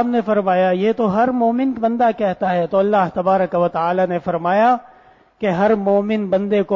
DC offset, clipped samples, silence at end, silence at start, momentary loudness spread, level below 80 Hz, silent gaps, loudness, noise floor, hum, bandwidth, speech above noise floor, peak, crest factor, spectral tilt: under 0.1%; under 0.1%; 0 s; 0 s; 4 LU; -56 dBFS; none; -17 LUFS; -49 dBFS; none; 7.2 kHz; 33 dB; -4 dBFS; 14 dB; -8.5 dB/octave